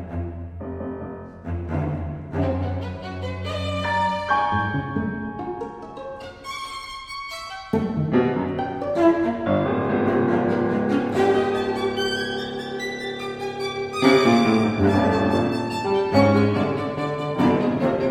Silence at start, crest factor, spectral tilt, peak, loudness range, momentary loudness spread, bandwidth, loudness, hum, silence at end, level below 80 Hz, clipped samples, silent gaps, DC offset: 0 s; 18 dB; -6.5 dB/octave; -4 dBFS; 9 LU; 14 LU; 14.5 kHz; -23 LUFS; none; 0 s; -46 dBFS; under 0.1%; none; under 0.1%